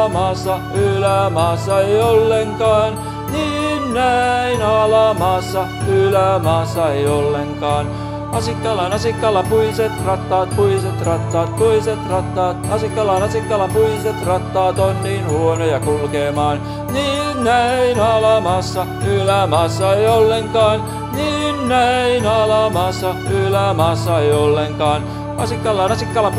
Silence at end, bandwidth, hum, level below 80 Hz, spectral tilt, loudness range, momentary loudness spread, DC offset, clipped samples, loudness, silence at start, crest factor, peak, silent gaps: 0 s; 14 kHz; none; -36 dBFS; -5.5 dB/octave; 2 LU; 6 LU; under 0.1%; under 0.1%; -16 LUFS; 0 s; 16 dB; 0 dBFS; none